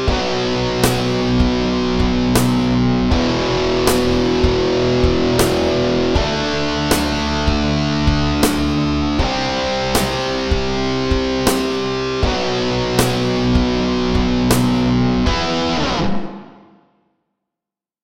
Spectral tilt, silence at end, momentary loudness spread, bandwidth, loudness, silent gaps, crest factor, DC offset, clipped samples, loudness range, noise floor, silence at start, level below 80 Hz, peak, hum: -5 dB/octave; 1.55 s; 3 LU; 16.5 kHz; -17 LUFS; none; 16 dB; under 0.1%; under 0.1%; 2 LU; -87 dBFS; 0 s; -26 dBFS; 0 dBFS; none